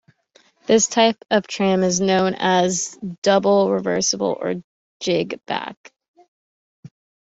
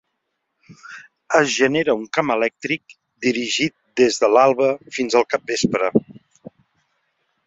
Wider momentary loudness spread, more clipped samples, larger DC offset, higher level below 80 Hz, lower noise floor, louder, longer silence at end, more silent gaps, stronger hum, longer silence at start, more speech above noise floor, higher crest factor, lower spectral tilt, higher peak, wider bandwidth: about the same, 11 LU vs 11 LU; neither; neither; about the same, -62 dBFS vs -60 dBFS; second, -57 dBFS vs -75 dBFS; about the same, -19 LUFS vs -19 LUFS; second, 0.35 s vs 1.35 s; first, 3.18-3.22 s, 4.64-5.00 s, 5.77-5.84 s, 6.08-6.14 s, 6.28-6.83 s vs none; neither; second, 0.7 s vs 0.85 s; second, 38 dB vs 56 dB; about the same, 18 dB vs 20 dB; about the same, -3.5 dB/octave vs -4 dB/octave; about the same, -2 dBFS vs -2 dBFS; about the same, 8.2 kHz vs 8 kHz